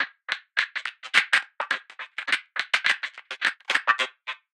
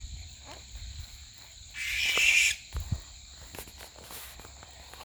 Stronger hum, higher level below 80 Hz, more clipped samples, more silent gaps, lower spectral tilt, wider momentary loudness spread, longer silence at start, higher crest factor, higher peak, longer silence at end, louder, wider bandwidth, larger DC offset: neither; second, under -90 dBFS vs -48 dBFS; neither; neither; second, 1 dB/octave vs -0.5 dB/octave; second, 11 LU vs 25 LU; about the same, 0 s vs 0 s; about the same, 24 dB vs 22 dB; first, -4 dBFS vs -12 dBFS; first, 0.2 s vs 0 s; about the same, -25 LUFS vs -26 LUFS; second, 16 kHz vs over 20 kHz; neither